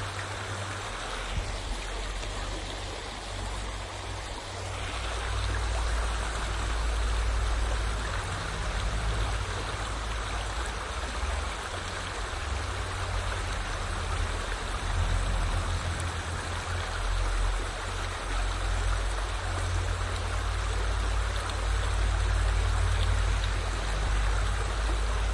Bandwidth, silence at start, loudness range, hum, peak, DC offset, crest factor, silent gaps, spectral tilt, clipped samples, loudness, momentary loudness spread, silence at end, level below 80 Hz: 11.5 kHz; 0 s; 5 LU; none; -16 dBFS; under 0.1%; 14 dB; none; -4 dB/octave; under 0.1%; -32 LUFS; 6 LU; 0 s; -32 dBFS